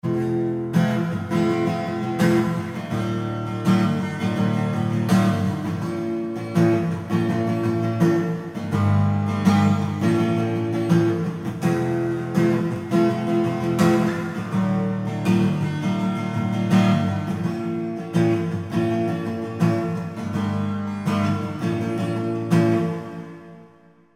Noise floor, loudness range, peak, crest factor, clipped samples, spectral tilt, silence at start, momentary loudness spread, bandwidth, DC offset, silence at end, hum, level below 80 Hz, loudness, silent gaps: -52 dBFS; 3 LU; -4 dBFS; 16 dB; under 0.1%; -7.5 dB/octave; 0.05 s; 7 LU; 15.5 kHz; under 0.1%; 0.5 s; none; -56 dBFS; -22 LUFS; none